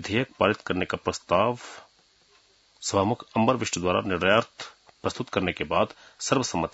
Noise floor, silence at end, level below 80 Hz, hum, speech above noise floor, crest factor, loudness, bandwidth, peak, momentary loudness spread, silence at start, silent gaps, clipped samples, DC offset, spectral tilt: -61 dBFS; 0.05 s; -58 dBFS; none; 35 dB; 22 dB; -26 LUFS; 8 kHz; -6 dBFS; 10 LU; 0 s; none; under 0.1%; under 0.1%; -4.5 dB/octave